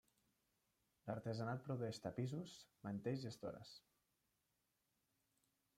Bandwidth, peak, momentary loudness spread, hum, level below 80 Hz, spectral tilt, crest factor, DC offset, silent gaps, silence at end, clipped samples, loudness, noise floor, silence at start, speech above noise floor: 15.5 kHz; -32 dBFS; 11 LU; none; -82 dBFS; -6.5 dB/octave; 18 dB; under 0.1%; none; 2 s; under 0.1%; -48 LUFS; -87 dBFS; 1.05 s; 40 dB